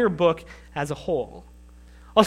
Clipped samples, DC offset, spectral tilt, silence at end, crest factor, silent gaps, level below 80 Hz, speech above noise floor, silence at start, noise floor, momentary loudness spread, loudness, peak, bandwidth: under 0.1%; under 0.1%; -5.5 dB/octave; 0 s; 24 dB; none; -48 dBFS; 22 dB; 0 s; -47 dBFS; 14 LU; -26 LUFS; 0 dBFS; 13.5 kHz